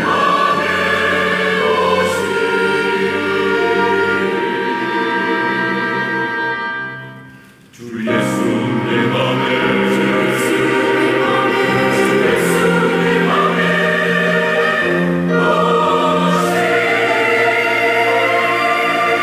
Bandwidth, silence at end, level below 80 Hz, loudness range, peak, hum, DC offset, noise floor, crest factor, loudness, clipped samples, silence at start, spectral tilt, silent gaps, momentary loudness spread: 16 kHz; 0 s; -56 dBFS; 5 LU; -4 dBFS; none; under 0.1%; -41 dBFS; 12 dB; -15 LUFS; under 0.1%; 0 s; -5 dB/octave; none; 4 LU